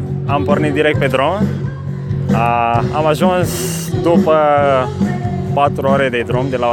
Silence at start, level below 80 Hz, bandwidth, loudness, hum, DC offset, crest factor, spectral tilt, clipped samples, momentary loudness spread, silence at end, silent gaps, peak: 0 s; -38 dBFS; 19 kHz; -15 LUFS; none; under 0.1%; 14 dB; -6.5 dB/octave; under 0.1%; 7 LU; 0 s; none; 0 dBFS